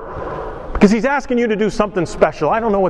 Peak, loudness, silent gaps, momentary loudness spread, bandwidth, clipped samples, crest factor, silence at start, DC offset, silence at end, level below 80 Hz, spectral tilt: 0 dBFS; -17 LUFS; none; 13 LU; 10.5 kHz; 0.1%; 16 dB; 0 s; under 0.1%; 0 s; -32 dBFS; -6.5 dB/octave